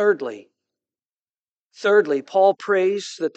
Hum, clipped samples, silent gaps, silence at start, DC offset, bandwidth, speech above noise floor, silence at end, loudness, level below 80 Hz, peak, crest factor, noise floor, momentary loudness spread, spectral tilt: none; under 0.1%; 1.06-1.70 s; 0 s; under 0.1%; 8.4 kHz; over 70 dB; 0.1 s; -20 LUFS; -88 dBFS; -4 dBFS; 18 dB; under -90 dBFS; 8 LU; -4.5 dB/octave